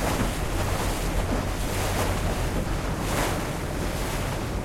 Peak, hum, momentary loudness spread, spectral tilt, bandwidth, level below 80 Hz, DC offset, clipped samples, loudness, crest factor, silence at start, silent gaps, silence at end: -12 dBFS; none; 3 LU; -4.5 dB/octave; 16.5 kHz; -32 dBFS; under 0.1%; under 0.1%; -28 LUFS; 14 dB; 0 s; none; 0 s